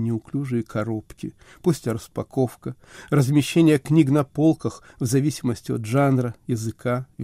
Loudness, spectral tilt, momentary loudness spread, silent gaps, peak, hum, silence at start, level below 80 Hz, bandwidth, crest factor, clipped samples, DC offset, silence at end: -23 LUFS; -7 dB/octave; 13 LU; none; -6 dBFS; none; 0 s; -54 dBFS; 16 kHz; 18 dB; under 0.1%; under 0.1%; 0 s